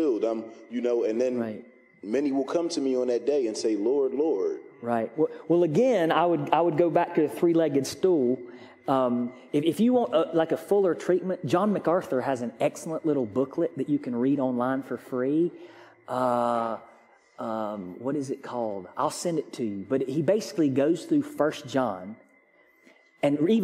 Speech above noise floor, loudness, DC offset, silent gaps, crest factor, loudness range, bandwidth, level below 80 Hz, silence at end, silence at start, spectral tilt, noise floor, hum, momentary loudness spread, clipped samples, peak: 35 dB; -26 LUFS; under 0.1%; none; 22 dB; 6 LU; 15 kHz; -74 dBFS; 0 s; 0 s; -6.5 dB/octave; -61 dBFS; none; 10 LU; under 0.1%; -4 dBFS